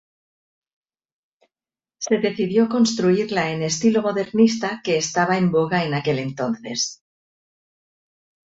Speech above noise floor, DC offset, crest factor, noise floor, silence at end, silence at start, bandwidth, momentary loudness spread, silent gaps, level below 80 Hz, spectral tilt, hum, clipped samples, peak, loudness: over 70 dB; under 0.1%; 18 dB; under -90 dBFS; 1.5 s; 2 s; 8 kHz; 7 LU; none; -62 dBFS; -5 dB/octave; none; under 0.1%; -4 dBFS; -21 LUFS